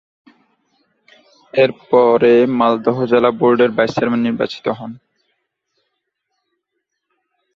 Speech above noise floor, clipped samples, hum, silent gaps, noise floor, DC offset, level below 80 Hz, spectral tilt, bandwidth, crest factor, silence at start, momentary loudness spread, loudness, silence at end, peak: 61 dB; under 0.1%; none; none; -75 dBFS; under 0.1%; -60 dBFS; -7 dB/octave; 6.8 kHz; 16 dB; 1.55 s; 11 LU; -15 LUFS; 2.6 s; -2 dBFS